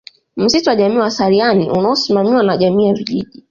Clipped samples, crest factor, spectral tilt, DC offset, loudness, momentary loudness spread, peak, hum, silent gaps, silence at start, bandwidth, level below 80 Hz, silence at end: under 0.1%; 12 dB; -5.5 dB/octave; under 0.1%; -14 LUFS; 6 LU; -2 dBFS; none; none; 0.35 s; 7.4 kHz; -52 dBFS; 0.25 s